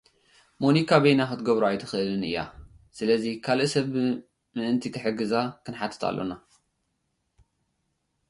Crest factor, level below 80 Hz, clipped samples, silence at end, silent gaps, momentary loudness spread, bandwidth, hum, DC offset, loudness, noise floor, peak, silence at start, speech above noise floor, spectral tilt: 20 dB; -60 dBFS; under 0.1%; 1.9 s; none; 13 LU; 11.5 kHz; none; under 0.1%; -26 LUFS; -76 dBFS; -6 dBFS; 0.6 s; 51 dB; -6 dB/octave